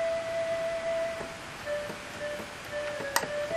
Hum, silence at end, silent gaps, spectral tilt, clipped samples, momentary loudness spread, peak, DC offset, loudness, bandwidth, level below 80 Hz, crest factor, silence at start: none; 0 s; none; -2.5 dB/octave; under 0.1%; 8 LU; -6 dBFS; under 0.1%; -33 LUFS; 15.5 kHz; -60 dBFS; 28 dB; 0 s